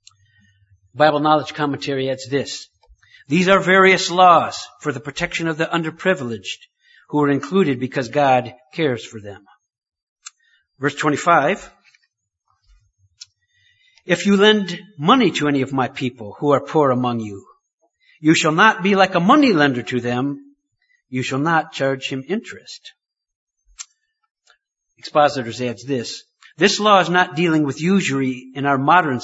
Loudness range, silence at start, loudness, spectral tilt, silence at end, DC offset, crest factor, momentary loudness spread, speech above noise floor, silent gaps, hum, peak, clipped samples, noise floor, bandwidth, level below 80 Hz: 8 LU; 0.95 s; -18 LUFS; -5 dB/octave; 0 s; under 0.1%; 20 dB; 16 LU; 52 dB; 10.03-10.16 s, 17.73-17.78 s, 23.35-23.47 s, 24.31-24.35 s; none; 0 dBFS; under 0.1%; -70 dBFS; 8 kHz; -60 dBFS